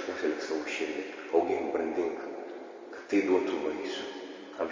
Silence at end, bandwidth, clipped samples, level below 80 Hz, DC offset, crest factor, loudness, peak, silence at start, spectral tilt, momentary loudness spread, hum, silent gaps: 0 s; 7.6 kHz; under 0.1%; -70 dBFS; under 0.1%; 20 dB; -32 LUFS; -12 dBFS; 0 s; -4 dB/octave; 15 LU; none; none